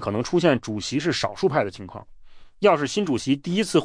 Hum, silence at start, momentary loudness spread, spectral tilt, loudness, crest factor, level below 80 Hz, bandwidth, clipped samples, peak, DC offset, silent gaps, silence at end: none; 0 s; 10 LU; -5 dB/octave; -23 LUFS; 18 dB; -54 dBFS; 10.5 kHz; under 0.1%; -6 dBFS; under 0.1%; none; 0 s